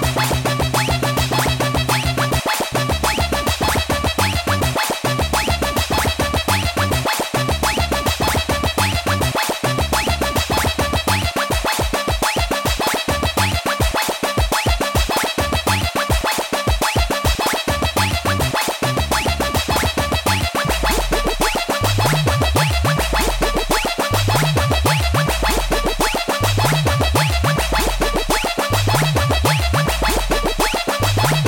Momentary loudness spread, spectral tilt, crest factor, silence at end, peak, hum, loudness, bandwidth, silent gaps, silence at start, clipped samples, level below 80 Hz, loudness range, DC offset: 3 LU; -4 dB/octave; 14 dB; 0 s; -2 dBFS; none; -18 LUFS; 17 kHz; none; 0 s; under 0.1%; -26 dBFS; 1 LU; under 0.1%